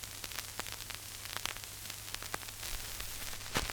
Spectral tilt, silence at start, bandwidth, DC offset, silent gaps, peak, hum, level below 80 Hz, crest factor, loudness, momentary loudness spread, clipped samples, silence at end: -1.5 dB/octave; 0 s; over 20 kHz; under 0.1%; none; -12 dBFS; none; -52 dBFS; 30 dB; -40 LUFS; 4 LU; under 0.1%; 0 s